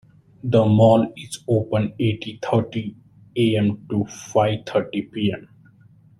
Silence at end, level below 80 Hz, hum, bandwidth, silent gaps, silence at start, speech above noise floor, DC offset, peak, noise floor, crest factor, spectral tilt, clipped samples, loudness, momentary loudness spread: 0.8 s; -54 dBFS; none; 12 kHz; none; 0.45 s; 31 dB; under 0.1%; -2 dBFS; -52 dBFS; 18 dB; -7 dB/octave; under 0.1%; -21 LUFS; 15 LU